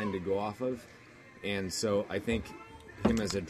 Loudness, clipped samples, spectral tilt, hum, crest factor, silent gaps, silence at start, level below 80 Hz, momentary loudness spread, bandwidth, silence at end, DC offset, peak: -33 LUFS; under 0.1%; -5 dB/octave; none; 22 dB; none; 0 s; -50 dBFS; 19 LU; 14 kHz; 0 s; under 0.1%; -12 dBFS